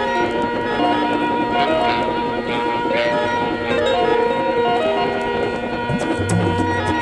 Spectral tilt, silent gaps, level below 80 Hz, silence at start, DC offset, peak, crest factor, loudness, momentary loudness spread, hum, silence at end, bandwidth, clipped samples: -5.5 dB/octave; none; -44 dBFS; 0 s; under 0.1%; -4 dBFS; 14 dB; -19 LUFS; 4 LU; none; 0 s; 11.5 kHz; under 0.1%